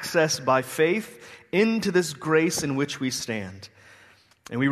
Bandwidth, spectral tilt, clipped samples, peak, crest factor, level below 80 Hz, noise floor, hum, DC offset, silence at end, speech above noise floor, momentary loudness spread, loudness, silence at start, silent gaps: 13.5 kHz; -4.5 dB/octave; under 0.1%; -6 dBFS; 18 dB; -64 dBFS; -56 dBFS; none; under 0.1%; 0 s; 31 dB; 14 LU; -24 LUFS; 0 s; none